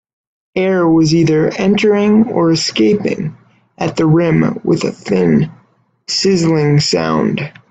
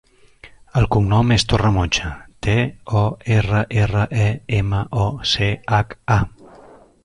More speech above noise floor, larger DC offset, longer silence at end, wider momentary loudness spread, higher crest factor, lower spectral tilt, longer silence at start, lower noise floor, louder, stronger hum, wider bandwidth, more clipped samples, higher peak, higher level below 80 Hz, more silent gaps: first, 41 dB vs 28 dB; neither; second, 0.2 s vs 0.75 s; first, 9 LU vs 5 LU; about the same, 12 dB vs 16 dB; about the same, -6 dB/octave vs -5.5 dB/octave; about the same, 0.55 s vs 0.45 s; first, -53 dBFS vs -46 dBFS; first, -13 LUFS vs -19 LUFS; neither; second, 8.8 kHz vs 10.5 kHz; neither; about the same, 0 dBFS vs -2 dBFS; second, -48 dBFS vs -34 dBFS; neither